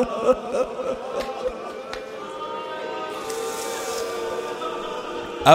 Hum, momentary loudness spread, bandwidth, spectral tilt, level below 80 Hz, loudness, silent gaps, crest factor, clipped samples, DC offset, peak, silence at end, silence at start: none; 11 LU; 16 kHz; -4 dB/octave; -52 dBFS; -28 LUFS; none; 24 dB; under 0.1%; under 0.1%; 0 dBFS; 0 s; 0 s